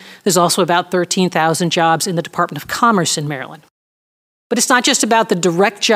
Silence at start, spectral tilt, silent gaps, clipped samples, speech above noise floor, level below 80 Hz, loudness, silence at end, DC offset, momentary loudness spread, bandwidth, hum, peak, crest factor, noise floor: 0 s; -3.5 dB/octave; 3.71-4.50 s; under 0.1%; over 75 dB; -62 dBFS; -15 LUFS; 0 s; under 0.1%; 8 LU; 16.5 kHz; none; 0 dBFS; 16 dB; under -90 dBFS